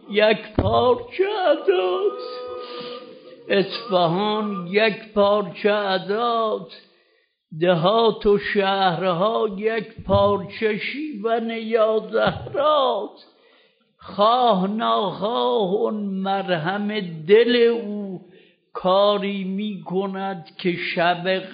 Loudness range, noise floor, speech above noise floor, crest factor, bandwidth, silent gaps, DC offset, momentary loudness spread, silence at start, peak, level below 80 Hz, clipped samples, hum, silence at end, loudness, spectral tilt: 2 LU; -64 dBFS; 44 dB; 18 dB; 5.2 kHz; none; under 0.1%; 12 LU; 0.05 s; -4 dBFS; -50 dBFS; under 0.1%; none; 0 s; -21 LUFS; -3.5 dB/octave